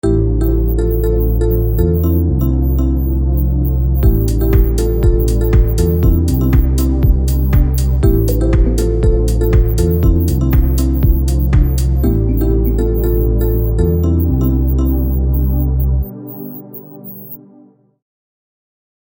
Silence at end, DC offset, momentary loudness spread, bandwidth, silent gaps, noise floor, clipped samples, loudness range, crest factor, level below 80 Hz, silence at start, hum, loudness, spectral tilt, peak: 1.7 s; under 0.1%; 3 LU; 17 kHz; none; -46 dBFS; under 0.1%; 4 LU; 12 dB; -14 dBFS; 0.05 s; none; -14 LUFS; -8.5 dB/octave; 0 dBFS